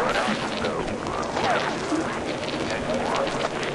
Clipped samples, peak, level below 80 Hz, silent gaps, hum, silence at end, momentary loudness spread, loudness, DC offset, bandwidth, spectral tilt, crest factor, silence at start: under 0.1%; -10 dBFS; -46 dBFS; none; none; 0 s; 5 LU; -26 LUFS; under 0.1%; 11.5 kHz; -4 dB/octave; 16 dB; 0 s